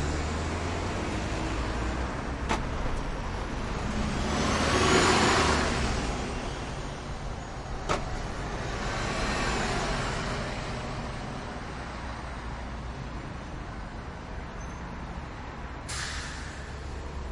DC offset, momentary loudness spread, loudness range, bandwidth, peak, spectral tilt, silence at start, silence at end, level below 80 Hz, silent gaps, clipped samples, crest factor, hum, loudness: under 0.1%; 14 LU; 12 LU; 11.5 kHz; -10 dBFS; -4.5 dB/octave; 0 s; 0 s; -38 dBFS; none; under 0.1%; 20 dB; none; -31 LUFS